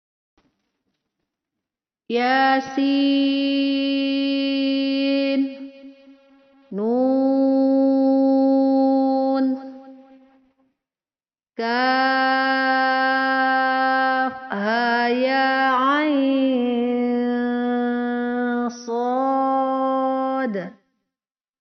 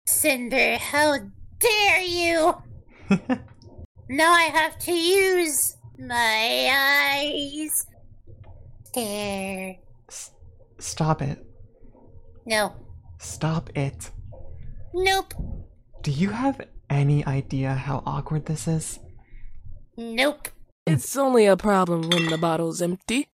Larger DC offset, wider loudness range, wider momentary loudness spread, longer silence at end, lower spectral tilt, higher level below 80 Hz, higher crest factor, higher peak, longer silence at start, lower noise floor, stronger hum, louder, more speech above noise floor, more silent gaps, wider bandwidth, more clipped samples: neither; second, 4 LU vs 9 LU; second, 8 LU vs 19 LU; first, 0.9 s vs 0.1 s; second, -1.5 dB/octave vs -4 dB/octave; second, -70 dBFS vs -46 dBFS; about the same, 14 dB vs 18 dB; about the same, -8 dBFS vs -6 dBFS; first, 2.1 s vs 0.05 s; first, under -90 dBFS vs -49 dBFS; neither; first, -20 LUFS vs -23 LUFS; first, over 71 dB vs 26 dB; second, none vs 3.85-3.95 s, 20.72-20.86 s; second, 6.4 kHz vs 16.5 kHz; neither